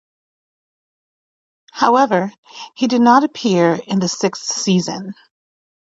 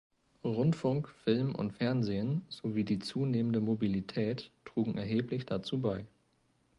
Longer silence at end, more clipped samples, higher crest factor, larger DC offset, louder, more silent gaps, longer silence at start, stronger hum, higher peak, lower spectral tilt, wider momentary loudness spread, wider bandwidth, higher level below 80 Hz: about the same, 0.7 s vs 0.7 s; neither; about the same, 18 dB vs 18 dB; neither; first, -16 LUFS vs -34 LUFS; first, 2.38-2.43 s vs none; first, 1.75 s vs 0.45 s; neither; first, 0 dBFS vs -16 dBFS; second, -4.5 dB/octave vs -8 dB/octave; first, 18 LU vs 5 LU; second, 8 kHz vs 11.5 kHz; about the same, -66 dBFS vs -64 dBFS